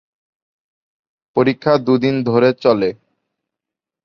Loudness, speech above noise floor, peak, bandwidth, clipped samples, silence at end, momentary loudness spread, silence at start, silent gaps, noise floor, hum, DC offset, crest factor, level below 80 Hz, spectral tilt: -16 LUFS; 71 dB; -2 dBFS; 6.6 kHz; under 0.1%; 1.1 s; 5 LU; 1.35 s; none; -85 dBFS; none; under 0.1%; 16 dB; -58 dBFS; -8 dB/octave